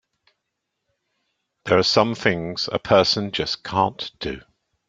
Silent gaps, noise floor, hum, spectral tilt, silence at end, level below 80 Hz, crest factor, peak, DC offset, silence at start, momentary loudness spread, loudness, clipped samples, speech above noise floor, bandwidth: none; -79 dBFS; none; -4.5 dB/octave; 0.5 s; -54 dBFS; 22 dB; -2 dBFS; under 0.1%; 1.65 s; 14 LU; -21 LUFS; under 0.1%; 58 dB; 9 kHz